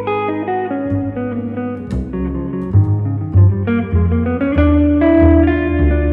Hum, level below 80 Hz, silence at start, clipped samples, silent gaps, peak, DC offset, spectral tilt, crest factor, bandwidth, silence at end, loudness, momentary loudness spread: none; -24 dBFS; 0 s; under 0.1%; none; -2 dBFS; under 0.1%; -11 dB/octave; 12 dB; 3.9 kHz; 0 s; -15 LUFS; 11 LU